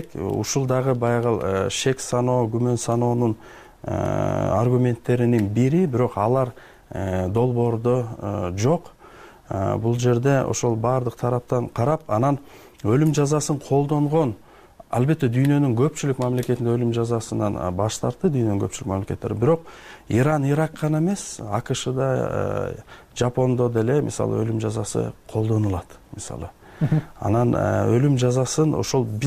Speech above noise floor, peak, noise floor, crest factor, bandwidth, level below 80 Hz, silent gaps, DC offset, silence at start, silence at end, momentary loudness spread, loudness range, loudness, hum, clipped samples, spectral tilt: 24 dB; -8 dBFS; -46 dBFS; 14 dB; 15 kHz; -48 dBFS; none; under 0.1%; 0 s; 0 s; 8 LU; 2 LU; -22 LUFS; none; under 0.1%; -6.5 dB/octave